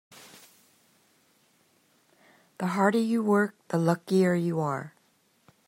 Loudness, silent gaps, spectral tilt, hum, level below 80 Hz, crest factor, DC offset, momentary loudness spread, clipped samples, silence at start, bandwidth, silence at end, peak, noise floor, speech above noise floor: -26 LUFS; none; -7 dB/octave; none; -76 dBFS; 20 dB; under 0.1%; 15 LU; under 0.1%; 2.6 s; 16 kHz; 0.8 s; -8 dBFS; -67 dBFS; 42 dB